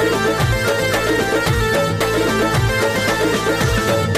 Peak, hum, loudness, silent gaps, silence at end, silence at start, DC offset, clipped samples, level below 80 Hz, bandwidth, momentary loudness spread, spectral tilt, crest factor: -6 dBFS; none; -17 LUFS; none; 0 s; 0 s; under 0.1%; under 0.1%; -30 dBFS; 15.5 kHz; 1 LU; -4.5 dB/octave; 10 dB